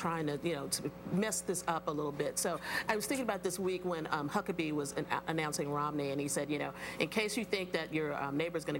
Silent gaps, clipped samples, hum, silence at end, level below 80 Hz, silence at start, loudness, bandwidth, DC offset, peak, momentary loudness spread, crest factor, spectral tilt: none; under 0.1%; none; 0 s; -64 dBFS; 0 s; -36 LUFS; 17 kHz; under 0.1%; -16 dBFS; 3 LU; 20 dB; -4 dB/octave